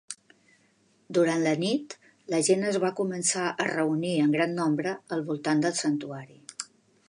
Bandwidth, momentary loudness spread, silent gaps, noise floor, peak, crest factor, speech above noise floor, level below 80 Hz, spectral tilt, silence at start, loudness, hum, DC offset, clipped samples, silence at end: 11.5 kHz; 17 LU; none; -65 dBFS; -10 dBFS; 18 dB; 39 dB; -78 dBFS; -4.5 dB/octave; 0.1 s; -27 LUFS; none; under 0.1%; under 0.1%; 0.45 s